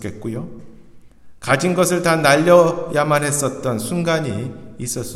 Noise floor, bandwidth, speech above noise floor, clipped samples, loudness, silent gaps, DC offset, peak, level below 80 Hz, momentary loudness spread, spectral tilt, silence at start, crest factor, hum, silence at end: -42 dBFS; 15 kHz; 24 dB; under 0.1%; -17 LUFS; none; under 0.1%; 0 dBFS; -50 dBFS; 17 LU; -4.5 dB/octave; 0 s; 18 dB; none; 0 s